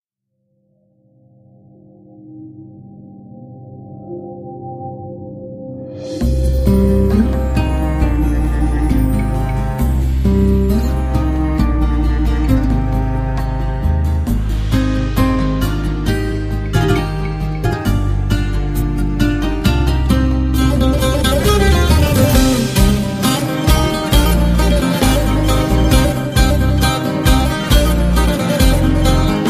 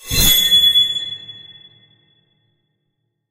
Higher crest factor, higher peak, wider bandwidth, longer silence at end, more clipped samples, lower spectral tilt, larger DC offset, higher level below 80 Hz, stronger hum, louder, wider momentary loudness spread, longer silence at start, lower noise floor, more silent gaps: about the same, 14 dB vs 18 dB; about the same, 0 dBFS vs 0 dBFS; about the same, 15.5 kHz vs 16 kHz; second, 0 s vs 1.9 s; neither; first, -6 dB/octave vs -0.5 dB/octave; neither; first, -18 dBFS vs -34 dBFS; neither; second, -15 LUFS vs -11 LUFS; second, 15 LU vs 20 LU; first, 2.25 s vs 0.05 s; about the same, -70 dBFS vs -72 dBFS; neither